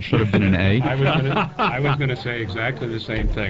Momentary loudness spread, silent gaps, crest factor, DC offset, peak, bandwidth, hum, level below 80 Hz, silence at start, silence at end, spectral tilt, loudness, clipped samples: 8 LU; none; 14 dB; 0.3%; -6 dBFS; 7.4 kHz; none; -34 dBFS; 0 s; 0 s; -8 dB/octave; -21 LUFS; under 0.1%